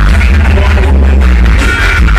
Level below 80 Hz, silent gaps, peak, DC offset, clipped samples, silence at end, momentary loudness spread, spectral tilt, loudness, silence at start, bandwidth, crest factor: -6 dBFS; none; 0 dBFS; under 0.1%; under 0.1%; 0 s; 1 LU; -6 dB/octave; -8 LUFS; 0 s; 11 kHz; 6 dB